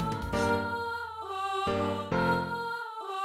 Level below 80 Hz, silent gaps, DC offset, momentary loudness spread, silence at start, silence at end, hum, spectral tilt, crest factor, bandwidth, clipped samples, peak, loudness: -52 dBFS; none; under 0.1%; 8 LU; 0 s; 0 s; none; -5.5 dB/octave; 16 dB; 16 kHz; under 0.1%; -16 dBFS; -31 LUFS